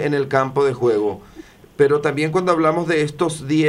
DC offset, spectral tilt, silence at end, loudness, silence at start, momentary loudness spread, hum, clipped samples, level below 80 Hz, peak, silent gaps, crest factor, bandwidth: under 0.1%; -6 dB/octave; 0 s; -19 LUFS; 0 s; 6 LU; none; under 0.1%; -54 dBFS; -2 dBFS; none; 16 dB; 12 kHz